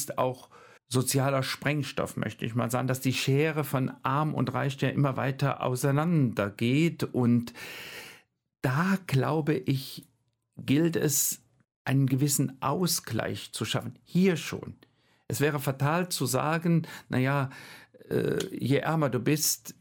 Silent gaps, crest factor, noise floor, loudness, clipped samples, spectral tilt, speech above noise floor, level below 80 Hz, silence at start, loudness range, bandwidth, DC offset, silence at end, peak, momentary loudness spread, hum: 11.76-11.85 s; 18 dB; -66 dBFS; -28 LUFS; under 0.1%; -5 dB/octave; 38 dB; -64 dBFS; 0 s; 2 LU; 17.5 kHz; under 0.1%; 0.1 s; -10 dBFS; 11 LU; none